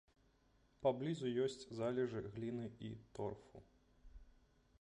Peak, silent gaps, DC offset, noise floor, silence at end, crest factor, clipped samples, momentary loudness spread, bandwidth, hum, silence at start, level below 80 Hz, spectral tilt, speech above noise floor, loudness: -24 dBFS; none; under 0.1%; -74 dBFS; 0.5 s; 20 dB; under 0.1%; 12 LU; 10.5 kHz; none; 0.8 s; -68 dBFS; -7 dB/octave; 32 dB; -43 LUFS